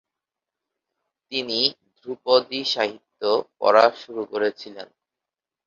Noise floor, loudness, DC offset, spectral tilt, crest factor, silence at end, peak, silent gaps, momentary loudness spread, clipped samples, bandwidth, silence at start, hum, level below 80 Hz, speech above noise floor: -88 dBFS; -22 LUFS; under 0.1%; -3.5 dB/octave; 22 dB; 0.85 s; -2 dBFS; none; 20 LU; under 0.1%; 7.4 kHz; 1.3 s; none; -74 dBFS; 66 dB